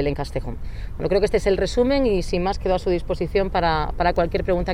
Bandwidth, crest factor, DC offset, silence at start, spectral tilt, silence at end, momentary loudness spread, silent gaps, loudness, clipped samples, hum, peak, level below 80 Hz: 13 kHz; 14 dB; under 0.1%; 0 s; -6.5 dB/octave; 0 s; 10 LU; none; -22 LUFS; under 0.1%; none; -6 dBFS; -30 dBFS